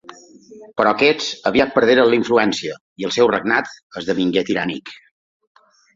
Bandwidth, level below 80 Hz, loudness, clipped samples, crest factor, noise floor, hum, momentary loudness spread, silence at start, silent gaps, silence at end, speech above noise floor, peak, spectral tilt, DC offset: 7.8 kHz; -56 dBFS; -17 LUFS; under 0.1%; 18 dB; -43 dBFS; none; 15 LU; 0.1 s; 2.81-2.96 s, 3.83-3.90 s; 1 s; 25 dB; -2 dBFS; -4.5 dB/octave; under 0.1%